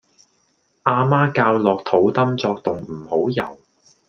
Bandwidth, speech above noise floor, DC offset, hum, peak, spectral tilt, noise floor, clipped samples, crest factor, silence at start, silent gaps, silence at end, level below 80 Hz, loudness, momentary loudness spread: 6.8 kHz; 46 dB; under 0.1%; none; 0 dBFS; -8 dB/octave; -64 dBFS; under 0.1%; 20 dB; 0.85 s; none; 0.55 s; -60 dBFS; -19 LUFS; 9 LU